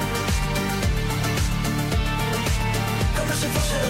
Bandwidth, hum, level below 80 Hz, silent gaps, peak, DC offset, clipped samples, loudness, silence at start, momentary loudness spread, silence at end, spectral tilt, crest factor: 16.5 kHz; none; -28 dBFS; none; -12 dBFS; under 0.1%; under 0.1%; -24 LUFS; 0 s; 1 LU; 0 s; -4.5 dB/octave; 12 dB